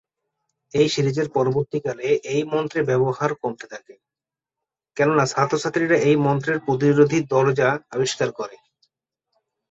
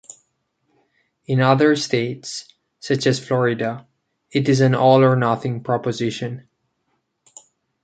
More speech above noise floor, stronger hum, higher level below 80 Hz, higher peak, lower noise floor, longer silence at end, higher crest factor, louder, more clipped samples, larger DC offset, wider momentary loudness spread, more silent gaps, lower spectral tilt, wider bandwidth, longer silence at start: first, 69 dB vs 53 dB; neither; about the same, -60 dBFS vs -62 dBFS; about the same, -4 dBFS vs -2 dBFS; first, -90 dBFS vs -71 dBFS; second, 1.15 s vs 1.45 s; about the same, 18 dB vs 18 dB; about the same, -21 LUFS vs -19 LUFS; neither; neither; second, 11 LU vs 16 LU; neither; about the same, -5.5 dB/octave vs -6 dB/octave; second, 8 kHz vs 9.2 kHz; second, 0.75 s vs 1.3 s